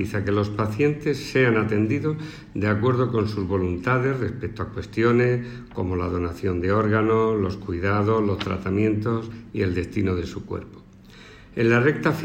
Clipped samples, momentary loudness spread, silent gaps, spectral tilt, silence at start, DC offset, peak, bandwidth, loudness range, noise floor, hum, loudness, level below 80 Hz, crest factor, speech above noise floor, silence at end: under 0.1%; 11 LU; none; -7.5 dB/octave; 0 s; under 0.1%; -6 dBFS; 16 kHz; 2 LU; -46 dBFS; none; -23 LUFS; -46 dBFS; 16 dB; 24 dB; 0 s